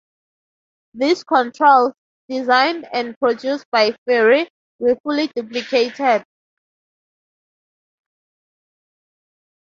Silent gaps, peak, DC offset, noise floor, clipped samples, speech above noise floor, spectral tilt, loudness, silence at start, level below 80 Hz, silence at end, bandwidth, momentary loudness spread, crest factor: 1.98-2.29 s, 3.16-3.21 s, 3.65-3.72 s, 3.98-4.06 s, 4.50-4.79 s, 5.00-5.04 s; -2 dBFS; under 0.1%; under -90 dBFS; under 0.1%; over 73 dB; -3.5 dB/octave; -18 LUFS; 0.95 s; -68 dBFS; 3.4 s; 7.6 kHz; 10 LU; 18 dB